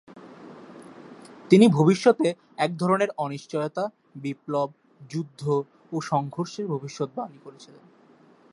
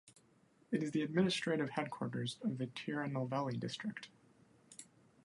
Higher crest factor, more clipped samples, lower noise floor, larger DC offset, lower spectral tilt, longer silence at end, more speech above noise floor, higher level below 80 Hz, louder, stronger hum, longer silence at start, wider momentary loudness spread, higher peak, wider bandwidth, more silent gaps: about the same, 22 dB vs 20 dB; neither; second, -56 dBFS vs -70 dBFS; neither; about the same, -6.5 dB/octave vs -5.5 dB/octave; first, 0.9 s vs 0.4 s; about the same, 32 dB vs 32 dB; first, -72 dBFS vs -78 dBFS; first, -25 LUFS vs -39 LUFS; neither; about the same, 0.15 s vs 0.05 s; first, 27 LU vs 21 LU; first, -4 dBFS vs -20 dBFS; about the same, 11.5 kHz vs 11.5 kHz; neither